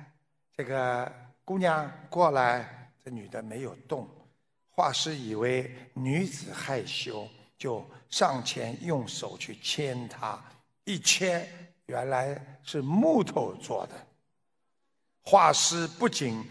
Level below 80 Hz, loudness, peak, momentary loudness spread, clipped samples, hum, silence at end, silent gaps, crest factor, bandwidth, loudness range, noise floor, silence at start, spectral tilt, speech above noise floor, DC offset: -72 dBFS; -29 LUFS; -6 dBFS; 17 LU; under 0.1%; none; 0 s; none; 24 dB; 11 kHz; 5 LU; -83 dBFS; 0 s; -3.5 dB/octave; 54 dB; under 0.1%